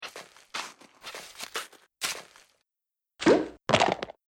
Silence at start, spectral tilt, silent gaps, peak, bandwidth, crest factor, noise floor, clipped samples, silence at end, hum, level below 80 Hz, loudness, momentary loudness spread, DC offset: 0 s; -3.5 dB/octave; none; -6 dBFS; 17.5 kHz; 24 dB; -89 dBFS; under 0.1%; 0.2 s; none; -62 dBFS; -28 LUFS; 19 LU; under 0.1%